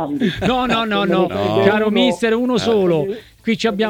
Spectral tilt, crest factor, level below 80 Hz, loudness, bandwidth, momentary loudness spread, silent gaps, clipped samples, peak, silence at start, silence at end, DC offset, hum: -6 dB/octave; 16 dB; -46 dBFS; -17 LUFS; 17 kHz; 5 LU; none; under 0.1%; 0 dBFS; 0 s; 0 s; under 0.1%; none